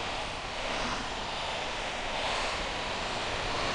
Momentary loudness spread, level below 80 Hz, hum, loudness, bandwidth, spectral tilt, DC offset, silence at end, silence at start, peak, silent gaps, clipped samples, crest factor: 3 LU; -46 dBFS; none; -33 LUFS; 10 kHz; -2.5 dB/octave; under 0.1%; 0 s; 0 s; -18 dBFS; none; under 0.1%; 14 dB